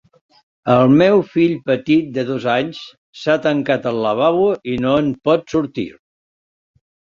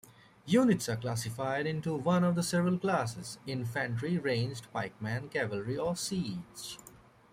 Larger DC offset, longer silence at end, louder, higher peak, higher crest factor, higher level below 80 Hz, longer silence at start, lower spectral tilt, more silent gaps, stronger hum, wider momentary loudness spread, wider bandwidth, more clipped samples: neither; first, 1.3 s vs 0.45 s; first, -17 LUFS vs -32 LUFS; first, 0 dBFS vs -14 dBFS; about the same, 16 dB vs 18 dB; first, -54 dBFS vs -66 dBFS; first, 0.65 s vs 0.45 s; first, -7.5 dB/octave vs -5.5 dB/octave; first, 2.98-3.13 s vs none; neither; about the same, 14 LU vs 12 LU; second, 7.4 kHz vs 16 kHz; neither